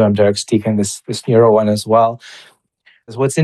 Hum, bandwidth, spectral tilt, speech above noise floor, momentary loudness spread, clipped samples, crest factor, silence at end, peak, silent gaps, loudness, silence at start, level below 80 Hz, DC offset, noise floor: none; 12.5 kHz; -6 dB/octave; 40 dB; 11 LU; under 0.1%; 14 dB; 0 s; 0 dBFS; none; -14 LUFS; 0 s; -60 dBFS; under 0.1%; -54 dBFS